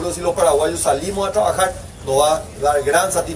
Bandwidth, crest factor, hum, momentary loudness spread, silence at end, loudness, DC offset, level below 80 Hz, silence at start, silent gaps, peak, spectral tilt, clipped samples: 11 kHz; 14 dB; none; 5 LU; 0 s; -17 LUFS; under 0.1%; -38 dBFS; 0 s; none; -4 dBFS; -3 dB/octave; under 0.1%